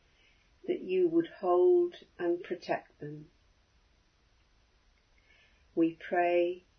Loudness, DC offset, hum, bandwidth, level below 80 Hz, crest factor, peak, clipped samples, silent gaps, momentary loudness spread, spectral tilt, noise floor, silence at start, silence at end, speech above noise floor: -30 LUFS; under 0.1%; none; 6 kHz; -70 dBFS; 16 dB; -16 dBFS; under 0.1%; none; 20 LU; -7.5 dB/octave; -68 dBFS; 0.65 s; 0.2 s; 38 dB